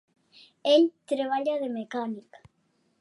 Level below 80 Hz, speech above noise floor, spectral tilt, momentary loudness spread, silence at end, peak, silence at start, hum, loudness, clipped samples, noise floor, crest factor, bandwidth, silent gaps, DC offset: -78 dBFS; 45 dB; -4.5 dB/octave; 12 LU; 0.8 s; -10 dBFS; 0.65 s; none; -27 LUFS; under 0.1%; -71 dBFS; 20 dB; 11.5 kHz; none; under 0.1%